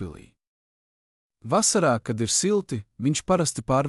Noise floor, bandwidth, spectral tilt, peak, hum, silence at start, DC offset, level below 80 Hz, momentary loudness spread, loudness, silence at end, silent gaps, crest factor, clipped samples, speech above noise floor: under -90 dBFS; 13.5 kHz; -4 dB/octave; -10 dBFS; none; 0 s; under 0.1%; -54 dBFS; 12 LU; -23 LUFS; 0 s; 0.47-1.30 s; 16 dB; under 0.1%; over 66 dB